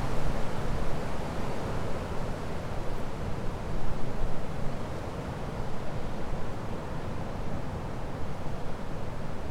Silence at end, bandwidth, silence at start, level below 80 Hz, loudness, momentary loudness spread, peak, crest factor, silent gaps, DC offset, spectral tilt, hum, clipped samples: 0 s; 10.5 kHz; 0 s; -36 dBFS; -36 LUFS; 4 LU; -14 dBFS; 14 dB; none; under 0.1%; -6.5 dB/octave; none; under 0.1%